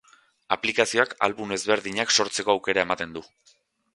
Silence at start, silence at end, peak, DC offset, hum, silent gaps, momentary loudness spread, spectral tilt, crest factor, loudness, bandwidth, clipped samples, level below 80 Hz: 0.5 s; 0.7 s; -2 dBFS; under 0.1%; none; none; 8 LU; -2 dB/octave; 24 dB; -24 LUFS; 11.5 kHz; under 0.1%; -62 dBFS